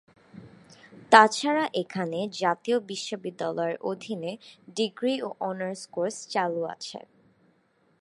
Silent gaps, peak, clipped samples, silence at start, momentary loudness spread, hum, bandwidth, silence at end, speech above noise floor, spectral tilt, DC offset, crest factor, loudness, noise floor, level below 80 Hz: none; 0 dBFS; under 0.1%; 0.35 s; 16 LU; none; 11.5 kHz; 1 s; 40 dB; -4 dB/octave; under 0.1%; 28 dB; -26 LUFS; -67 dBFS; -78 dBFS